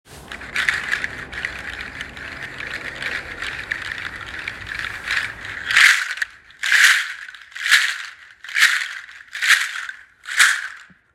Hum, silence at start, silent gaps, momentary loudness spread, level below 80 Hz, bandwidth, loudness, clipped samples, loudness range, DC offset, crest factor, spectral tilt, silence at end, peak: none; 0.1 s; none; 19 LU; -50 dBFS; 16.5 kHz; -19 LUFS; under 0.1%; 11 LU; under 0.1%; 22 dB; 1 dB/octave; 0.3 s; 0 dBFS